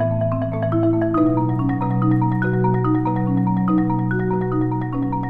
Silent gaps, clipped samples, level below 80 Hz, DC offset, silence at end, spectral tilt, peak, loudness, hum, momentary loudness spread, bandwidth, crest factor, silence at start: none; under 0.1%; -38 dBFS; under 0.1%; 0 s; -11.5 dB/octave; -8 dBFS; -20 LUFS; none; 3 LU; 3.9 kHz; 12 dB; 0 s